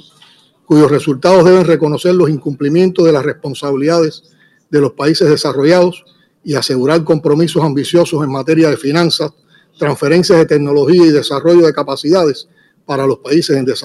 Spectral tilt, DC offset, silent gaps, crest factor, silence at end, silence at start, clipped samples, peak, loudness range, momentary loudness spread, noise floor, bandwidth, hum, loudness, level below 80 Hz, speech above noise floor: -6 dB/octave; under 0.1%; none; 10 dB; 0.05 s; 0.7 s; under 0.1%; 0 dBFS; 3 LU; 9 LU; -47 dBFS; 12.5 kHz; none; -12 LUFS; -54 dBFS; 36 dB